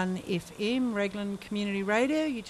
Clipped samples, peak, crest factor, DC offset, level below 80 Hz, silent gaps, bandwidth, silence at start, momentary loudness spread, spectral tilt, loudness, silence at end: under 0.1%; -14 dBFS; 16 dB; under 0.1%; -62 dBFS; none; 13.5 kHz; 0 s; 8 LU; -5.5 dB/octave; -30 LUFS; 0 s